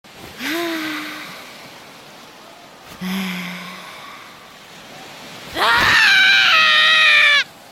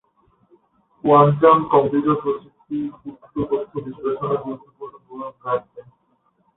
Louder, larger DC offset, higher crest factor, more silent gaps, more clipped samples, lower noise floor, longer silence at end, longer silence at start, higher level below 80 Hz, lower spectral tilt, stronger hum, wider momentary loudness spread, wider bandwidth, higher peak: first, -13 LUFS vs -19 LUFS; neither; about the same, 18 dB vs 20 dB; neither; neither; second, -41 dBFS vs -65 dBFS; second, 0.25 s vs 0.75 s; second, 0.15 s vs 1.05 s; about the same, -52 dBFS vs -56 dBFS; second, -1.5 dB/octave vs -12.5 dB/octave; neither; first, 25 LU vs 21 LU; first, 16.5 kHz vs 4 kHz; about the same, -2 dBFS vs -2 dBFS